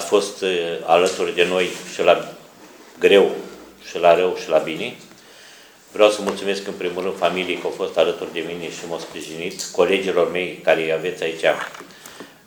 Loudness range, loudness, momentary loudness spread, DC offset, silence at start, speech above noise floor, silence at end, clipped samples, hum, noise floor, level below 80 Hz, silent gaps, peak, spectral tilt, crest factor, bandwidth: 4 LU; -20 LUFS; 16 LU; under 0.1%; 0 s; 26 dB; 0.2 s; under 0.1%; none; -46 dBFS; -64 dBFS; none; 0 dBFS; -3.5 dB/octave; 20 dB; over 20 kHz